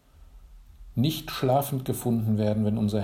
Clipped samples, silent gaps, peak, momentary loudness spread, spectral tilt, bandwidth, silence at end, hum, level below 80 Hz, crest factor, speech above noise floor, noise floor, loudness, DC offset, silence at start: under 0.1%; none; -12 dBFS; 4 LU; -6.5 dB/octave; 16 kHz; 0 s; none; -50 dBFS; 16 dB; 25 dB; -50 dBFS; -27 LUFS; under 0.1%; 0.2 s